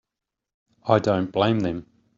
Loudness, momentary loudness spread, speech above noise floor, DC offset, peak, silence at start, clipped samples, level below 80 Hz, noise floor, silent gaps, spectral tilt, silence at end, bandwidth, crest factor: -23 LUFS; 13 LU; 64 dB; under 0.1%; -4 dBFS; 0.85 s; under 0.1%; -58 dBFS; -86 dBFS; none; -5.5 dB/octave; 0.35 s; 7.6 kHz; 22 dB